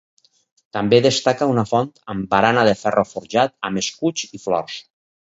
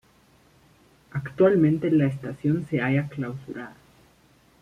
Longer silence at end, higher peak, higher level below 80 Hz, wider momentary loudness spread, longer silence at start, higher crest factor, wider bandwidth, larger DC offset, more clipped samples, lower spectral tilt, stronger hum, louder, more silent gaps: second, 0.4 s vs 0.9 s; first, 0 dBFS vs -8 dBFS; about the same, -56 dBFS vs -60 dBFS; second, 12 LU vs 17 LU; second, 0.75 s vs 1.15 s; about the same, 20 dB vs 18 dB; second, 8 kHz vs 10.5 kHz; neither; neither; second, -4.5 dB/octave vs -9.5 dB/octave; neither; first, -19 LUFS vs -24 LUFS; neither